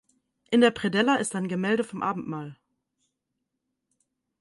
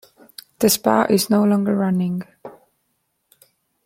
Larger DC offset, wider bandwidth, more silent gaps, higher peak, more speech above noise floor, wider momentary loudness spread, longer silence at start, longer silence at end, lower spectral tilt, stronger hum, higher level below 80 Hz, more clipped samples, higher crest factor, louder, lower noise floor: neither; second, 11.5 kHz vs 16.5 kHz; neither; second, -8 dBFS vs -2 dBFS; first, 57 dB vs 53 dB; second, 14 LU vs 24 LU; about the same, 0.5 s vs 0.6 s; first, 1.85 s vs 1.35 s; about the same, -5 dB/octave vs -5 dB/octave; neither; second, -68 dBFS vs -62 dBFS; neither; about the same, 20 dB vs 20 dB; second, -25 LUFS vs -18 LUFS; first, -82 dBFS vs -71 dBFS